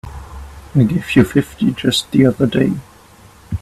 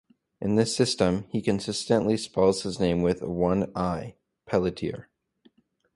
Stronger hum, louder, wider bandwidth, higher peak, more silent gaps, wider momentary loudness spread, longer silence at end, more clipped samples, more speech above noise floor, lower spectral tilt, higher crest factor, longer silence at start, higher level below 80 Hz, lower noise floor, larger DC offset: neither; first, -15 LUFS vs -26 LUFS; first, 14 kHz vs 11.5 kHz; first, 0 dBFS vs -8 dBFS; neither; first, 20 LU vs 11 LU; second, 0.05 s vs 0.95 s; neither; second, 29 dB vs 38 dB; about the same, -6 dB/octave vs -5.5 dB/octave; about the same, 16 dB vs 20 dB; second, 0.05 s vs 0.4 s; first, -38 dBFS vs -50 dBFS; second, -44 dBFS vs -63 dBFS; neither